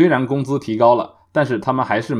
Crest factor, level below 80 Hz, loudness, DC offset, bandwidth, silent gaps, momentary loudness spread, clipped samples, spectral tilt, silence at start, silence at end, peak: 16 dB; -62 dBFS; -18 LUFS; under 0.1%; 11 kHz; none; 6 LU; under 0.1%; -7.5 dB/octave; 0 s; 0 s; -2 dBFS